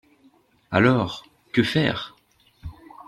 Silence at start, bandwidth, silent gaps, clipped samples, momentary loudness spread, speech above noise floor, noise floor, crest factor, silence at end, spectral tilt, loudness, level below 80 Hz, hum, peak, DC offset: 0.7 s; 12.5 kHz; none; under 0.1%; 23 LU; 40 dB; -60 dBFS; 22 dB; 0.35 s; -6.5 dB/octave; -22 LUFS; -52 dBFS; none; -2 dBFS; under 0.1%